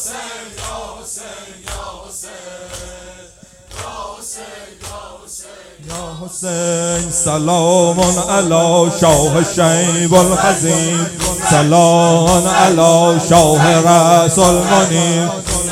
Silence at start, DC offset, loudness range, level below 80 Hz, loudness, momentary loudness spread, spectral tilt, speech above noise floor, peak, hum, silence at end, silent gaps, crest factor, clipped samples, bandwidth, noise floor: 0 s; under 0.1%; 20 LU; -36 dBFS; -11 LUFS; 21 LU; -4 dB/octave; 29 dB; 0 dBFS; none; 0 s; none; 14 dB; 0.1%; 16 kHz; -41 dBFS